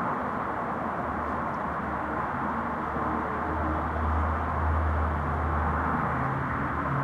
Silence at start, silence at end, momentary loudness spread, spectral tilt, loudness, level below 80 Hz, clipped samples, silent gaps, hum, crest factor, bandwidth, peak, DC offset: 0 s; 0 s; 3 LU; -8.5 dB/octave; -29 LUFS; -36 dBFS; under 0.1%; none; none; 14 dB; 5.8 kHz; -14 dBFS; under 0.1%